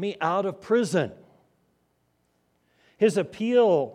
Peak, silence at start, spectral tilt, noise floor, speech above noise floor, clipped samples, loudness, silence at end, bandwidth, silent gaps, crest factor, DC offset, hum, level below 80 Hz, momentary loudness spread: -8 dBFS; 0 s; -6 dB/octave; -70 dBFS; 47 dB; under 0.1%; -24 LUFS; 0 s; 13 kHz; none; 18 dB; under 0.1%; 60 Hz at -60 dBFS; -72 dBFS; 7 LU